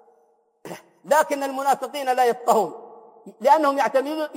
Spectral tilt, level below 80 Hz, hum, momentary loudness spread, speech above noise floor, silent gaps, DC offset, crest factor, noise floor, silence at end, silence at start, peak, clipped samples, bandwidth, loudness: -3.5 dB/octave; -82 dBFS; none; 22 LU; 42 dB; none; under 0.1%; 18 dB; -63 dBFS; 0 s; 0.65 s; -4 dBFS; under 0.1%; 16.5 kHz; -21 LUFS